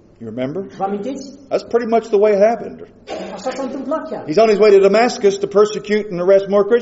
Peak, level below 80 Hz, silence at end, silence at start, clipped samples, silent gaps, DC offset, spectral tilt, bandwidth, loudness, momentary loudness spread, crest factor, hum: -2 dBFS; -58 dBFS; 0 s; 0.2 s; under 0.1%; none; under 0.1%; -4.5 dB/octave; 8 kHz; -16 LUFS; 16 LU; 14 dB; none